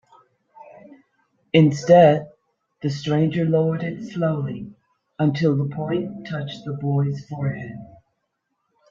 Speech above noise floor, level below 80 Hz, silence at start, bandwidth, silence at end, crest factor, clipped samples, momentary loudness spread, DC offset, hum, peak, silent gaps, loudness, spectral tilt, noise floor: 55 dB; -60 dBFS; 0.9 s; 7.4 kHz; 1.05 s; 20 dB; under 0.1%; 16 LU; under 0.1%; none; -2 dBFS; none; -21 LUFS; -7.5 dB/octave; -75 dBFS